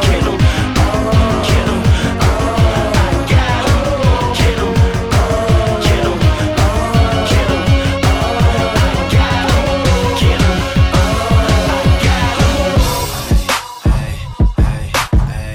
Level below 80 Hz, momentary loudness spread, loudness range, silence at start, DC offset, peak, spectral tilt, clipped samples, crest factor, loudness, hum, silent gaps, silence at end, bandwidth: -18 dBFS; 3 LU; 1 LU; 0 s; under 0.1%; 0 dBFS; -5.5 dB/octave; under 0.1%; 12 dB; -13 LUFS; none; none; 0 s; 17.5 kHz